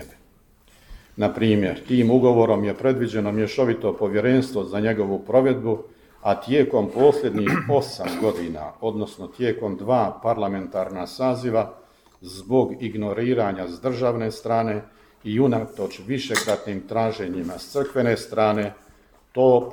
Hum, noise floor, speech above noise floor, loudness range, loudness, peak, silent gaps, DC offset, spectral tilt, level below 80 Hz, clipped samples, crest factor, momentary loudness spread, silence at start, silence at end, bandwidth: none; -56 dBFS; 34 dB; 5 LU; -23 LUFS; -2 dBFS; none; under 0.1%; -6.5 dB/octave; -54 dBFS; under 0.1%; 20 dB; 11 LU; 0 s; 0 s; 19 kHz